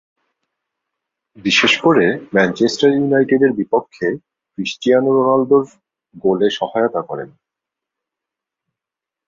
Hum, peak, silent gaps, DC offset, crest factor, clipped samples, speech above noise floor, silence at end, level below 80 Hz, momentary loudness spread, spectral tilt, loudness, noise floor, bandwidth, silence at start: none; -2 dBFS; none; under 0.1%; 16 dB; under 0.1%; 71 dB; 2 s; -60 dBFS; 13 LU; -5 dB/octave; -16 LUFS; -86 dBFS; 7.6 kHz; 1.45 s